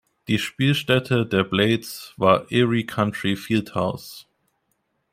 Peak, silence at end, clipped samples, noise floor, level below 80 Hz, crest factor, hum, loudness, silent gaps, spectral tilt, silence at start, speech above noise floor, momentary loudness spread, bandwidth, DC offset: -2 dBFS; 0.9 s; under 0.1%; -72 dBFS; -58 dBFS; 22 dB; none; -22 LUFS; none; -6 dB/octave; 0.3 s; 50 dB; 7 LU; 16 kHz; under 0.1%